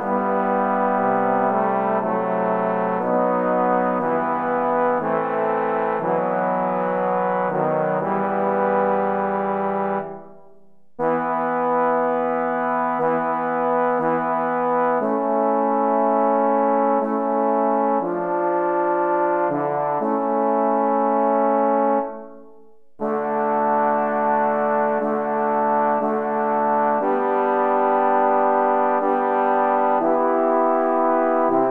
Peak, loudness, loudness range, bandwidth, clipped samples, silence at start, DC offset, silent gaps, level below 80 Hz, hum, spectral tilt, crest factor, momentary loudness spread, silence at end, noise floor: -6 dBFS; -20 LUFS; 3 LU; 4.2 kHz; under 0.1%; 0 s; 0.2%; none; -66 dBFS; none; -9.5 dB/octave; 14 dB; 4 LU; 0 s; -56 dBFS